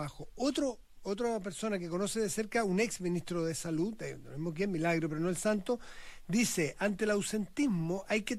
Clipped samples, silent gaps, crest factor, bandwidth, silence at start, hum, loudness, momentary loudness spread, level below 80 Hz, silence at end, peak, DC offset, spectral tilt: under 0.1%; none; 14 dB; 15.5 kHz; 0 s; none; -34 LUFS; 9 LU; -56 dBFS; 0 s; -20 dBFS; under 0.1%; -5 dB/octave